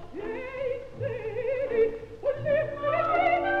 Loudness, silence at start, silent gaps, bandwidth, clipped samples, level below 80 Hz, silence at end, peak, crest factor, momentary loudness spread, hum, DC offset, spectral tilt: -28 LUFS; 0 s; none; 7.4 kHz; under 0.1%; -52 dBFS; 0 s; -12 dBFS; 16 dB; 10 LU; none; under 0.1%; -7.5 dB/octave